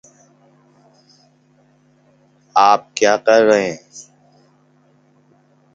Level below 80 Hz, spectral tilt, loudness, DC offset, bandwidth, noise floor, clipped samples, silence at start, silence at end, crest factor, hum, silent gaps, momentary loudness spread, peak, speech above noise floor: -66 dBFS; -3.5 dB/octave; -14 LUFS; under 0.1%; 7.8 kHz; -55 dBFS; under 0.1%; 2.55 s; 1.75 s; 20 dB; none; none; 23 LU; 0 dBFS; 41 dB